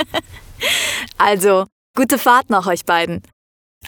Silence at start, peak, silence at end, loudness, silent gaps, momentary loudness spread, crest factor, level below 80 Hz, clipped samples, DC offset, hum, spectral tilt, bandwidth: 0 s; 0 dBFS; 0 s; -16 LUFS; 1.72-1.94 s, 3.33-3.81 s; 11 LU; 18 dB; -50 dBFS; under 0.1%; under 0.1%; none; -3 dB/octave; over 20 kHz